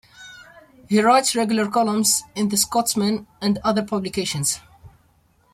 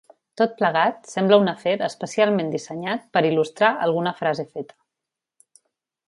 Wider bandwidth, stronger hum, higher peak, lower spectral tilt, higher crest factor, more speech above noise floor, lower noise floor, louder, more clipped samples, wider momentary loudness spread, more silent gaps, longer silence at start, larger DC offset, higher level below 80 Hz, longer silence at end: first, 16 kHz vs 11.5 kHz; neither; about the same, -4 dBFS vs -2 dBFS; second, -3.5 dB/octave vs -5.5 dB/octave; about the same, 18 dB vs 22 dB; second, 39 dB vs 65 dB; second, -60 dBFS vs -86 dBFS; about the same, -20 LUFS vs -21 LUFS; neither; about the same, 8 LU vs 10 LU; neither; second, 0.2 s vs 0.4 s; neither; first, -56 dBFS vs -72 dBFS; second, 0.65 s vs 1.45 s